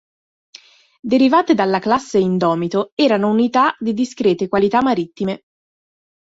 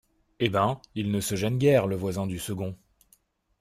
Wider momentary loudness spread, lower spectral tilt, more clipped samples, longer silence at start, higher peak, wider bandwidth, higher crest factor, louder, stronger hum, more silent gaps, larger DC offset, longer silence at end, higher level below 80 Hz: about the same, 8 LU vs 10 LU; about the same, -6 dB/octave vs -6 dB/octave; neither; first, 1.05 s vs 0.4 s; first, -2 dBFS vs -8 dBFS; second, 8 kHz vs 16 kHz; about the same, 16 dB vs 20 dB; first, -17 LUFS vs -27 LUFS; neither; first, 2.92-2.97 s vs none; neither; about the same, 0.85 s vs 0.85 s; about the same, -58 dBFS vs -58 dBFS